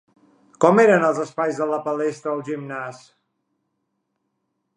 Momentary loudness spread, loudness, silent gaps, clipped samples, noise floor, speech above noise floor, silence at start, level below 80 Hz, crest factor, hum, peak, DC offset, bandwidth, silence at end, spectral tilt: 16 LU; -20 LUFS; none; under 0.1%; -75 dBFS; 55 dB; 0.6 s; -76 dBFS; 22 dB; none; -2 dBFS; under 0.1%; 10.5 kHz; 1.8 s; -6.5 dB/octave